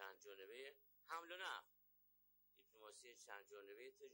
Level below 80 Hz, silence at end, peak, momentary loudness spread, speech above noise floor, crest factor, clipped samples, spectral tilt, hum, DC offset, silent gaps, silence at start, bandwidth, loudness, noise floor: under -90 dBFS; 0 s; -36 dBFS; 12 LU; 21 dB; 22 dB; under 0.1%; 0 dB/octave; 50 Hz at -95 dBFS; under 0.1%; none; 0 s; 16 kHz; -57 LUFS; -78 dBFS